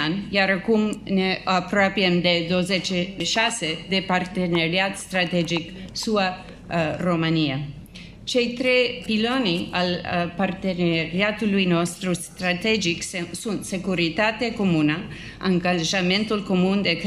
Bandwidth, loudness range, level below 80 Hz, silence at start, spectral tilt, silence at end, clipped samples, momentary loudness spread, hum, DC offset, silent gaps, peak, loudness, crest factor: 14 kHz; 2 LU; -50 dBFS; 0 s; -4.5 dB/octave; 0 s; under 0.1%; 8 LU; none; under 0.1%; none; -6 dBFS; -22 LUFS; 18 dB